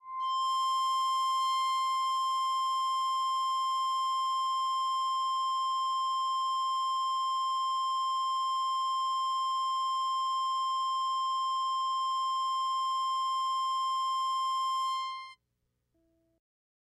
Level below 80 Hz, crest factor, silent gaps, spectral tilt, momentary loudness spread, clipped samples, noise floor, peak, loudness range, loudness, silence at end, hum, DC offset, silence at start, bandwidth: -86 dBFS; 8 dB; none; 4.5 dB/octave; 2 LU; under 0.1%; -80 dBFS; -22 dBFS; 2 LU; -30 LUFS; 1.55 s; 60 Hz at -85 dBFS; under 0.1%; 0.05 s; 13 kHz